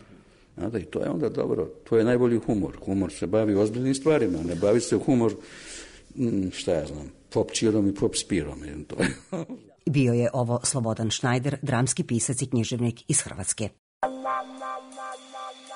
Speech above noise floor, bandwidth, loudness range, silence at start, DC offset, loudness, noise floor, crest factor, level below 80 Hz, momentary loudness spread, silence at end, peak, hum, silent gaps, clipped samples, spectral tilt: 28 dB; 11 kHz; 3 LU; 0.1 s; under 0.1%; -26 LUFS; -53 dBFS; 16 dB; -52 dBFS; 14 LU; 0 s; -10 dBFS; none; 13.79-14.01 s; under 0.1%; -5 dB/octave